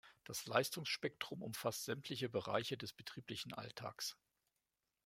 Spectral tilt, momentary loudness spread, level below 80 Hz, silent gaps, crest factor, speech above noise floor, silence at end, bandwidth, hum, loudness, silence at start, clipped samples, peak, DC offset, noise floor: -3.5 dB/octave; 10 LU; -80 dBFS; none; 28 dB; 46 dB; 0.9 s; 16.5 kHz; none; -43 LUFS; 0.05 s; under 0.1%; -16 dBFS; under 0.1%; -90 dBFS